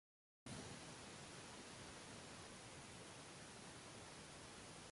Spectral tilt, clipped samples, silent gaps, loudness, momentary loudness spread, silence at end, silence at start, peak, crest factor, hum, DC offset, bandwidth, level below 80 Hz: -3 dB/octave; under 0.1%; none; -56 LUFS; 2 LU; 0 s; 0.45 s; -40 dBFS; 16 dB; none; under 0.1%; 11.5 kHz; -74 dBFS